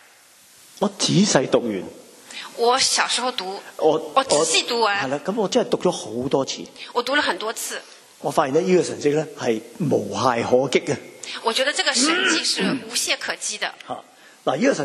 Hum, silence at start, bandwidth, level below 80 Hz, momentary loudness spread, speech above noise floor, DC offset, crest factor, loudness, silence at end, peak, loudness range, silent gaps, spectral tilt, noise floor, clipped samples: none; 0.8 s; 13.5 kHz; -66 dBFS; 12 LU; 30 dB; under 0.1%; 22 dB; -21 LUFS; 0 s; 0 dBFS; 3 LU; none; -3 dB/octave; -51 dBFS; under 0.1%